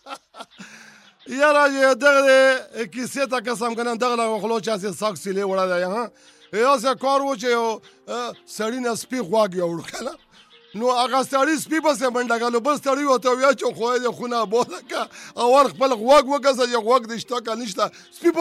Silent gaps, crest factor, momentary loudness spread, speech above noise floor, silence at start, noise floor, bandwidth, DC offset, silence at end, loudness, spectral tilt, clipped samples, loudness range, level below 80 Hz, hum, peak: none; 16 dB; 14 LU; 31 dB; 0.05 s; -51 dBFS; 15 kHz; under 0.1%; 0 s; -20 LUFS; -3.5 dB/octave; under 0.1%; 5 LU; -66 dBFS; none; -6 dBFS